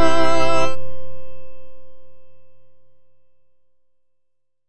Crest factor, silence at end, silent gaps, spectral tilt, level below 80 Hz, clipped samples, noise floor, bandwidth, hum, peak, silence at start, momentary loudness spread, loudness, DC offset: 14 dB; 0 s; none; -4.5 dB/octave; -46 dBFS; under 0.1%; -73 dBFS; 10.5 kHz; none; -2 dBFS; 0 s; 26 LU; -20 LUFS; under 0.1%